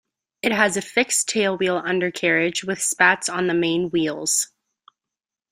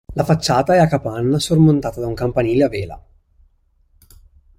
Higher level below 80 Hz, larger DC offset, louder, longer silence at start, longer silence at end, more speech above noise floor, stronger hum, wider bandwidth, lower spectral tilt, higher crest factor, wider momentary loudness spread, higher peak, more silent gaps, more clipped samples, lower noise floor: second, -64 dBFS vs -42 dBFS; neither; second, -20 LUFS vs -17 LUFS; first, 0.45 s vs 0.1 s; second, 1.05 s vs 1.6 s; first, 67 dB vs 42 dB; neither; first, 16 kHz vs 14.5 kHz; second, -2.5 dB/octave vs -6.5 dB/octave; about the same, 20 dB vs 16 dB; second, 6 LU vs 9 LU; about the same, -2 dBFS vs -2 dBFS; neither; neither; first, -88 dBFS vs -58 dBFS